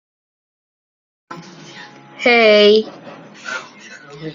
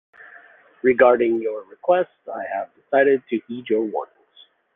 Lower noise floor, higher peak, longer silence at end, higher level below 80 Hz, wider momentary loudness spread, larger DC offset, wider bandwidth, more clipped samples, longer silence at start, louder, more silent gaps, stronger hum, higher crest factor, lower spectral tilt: second, -39 dBFS vs -54 dBFS; about the same, -2 dBFS vs -2 dBFS; second, 0 s vs 0.7 s; about the same, -68 dBFS vs -66 dBFS; first, 27 LU vs 14 LU; neither; first, 7.4 kHz vs 3.8 kHz; neither; first, 1.3 s vs 0.35 s; first, -12 LUFS vs -21 LUFS; neither; neither; about the same, 18 dB vs 20 dB; second, -4 dB/octave vs -9 dB/octave